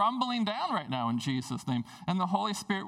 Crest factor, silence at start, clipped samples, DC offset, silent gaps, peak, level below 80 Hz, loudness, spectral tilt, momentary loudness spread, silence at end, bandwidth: 18 dB; 0 s; under 0.1%; under 0.1%; none; -14 dBFS; -70 dBFS; -32 LUFS; -5 dB/octave; 5 LU; 0 s; 14.5 kHz